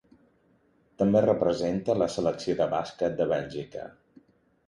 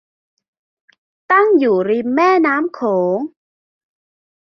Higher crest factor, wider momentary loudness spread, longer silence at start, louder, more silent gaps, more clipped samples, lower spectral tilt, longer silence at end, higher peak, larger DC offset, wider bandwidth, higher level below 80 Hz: about the same, 18 dB vs 16 dB; first, 14 LU vs 7 LU; second, 1 s vs 1.3 s; second, -27 LUFS vs -15 LUFS; neither; neither; about the same, -6.5 dB/octave vs -7 dB/octave; second, 0.8 s vs 1.25 s; second, -10 dBFS vs -2 dBFS; neither; first, 11 kHz vs 6.4 kHz; first, -58 dBFS vs -66 dBFS